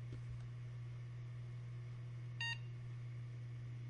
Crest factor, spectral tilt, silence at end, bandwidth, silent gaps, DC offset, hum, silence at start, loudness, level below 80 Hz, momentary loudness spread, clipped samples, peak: 16 dB; -5 dB/octave; 0 s; 10.5 kHz; none; under 0.1%; none; 0 s; -48 LUFS; -66 dBFS; 7 LU; under 0.1%; -30 dBFS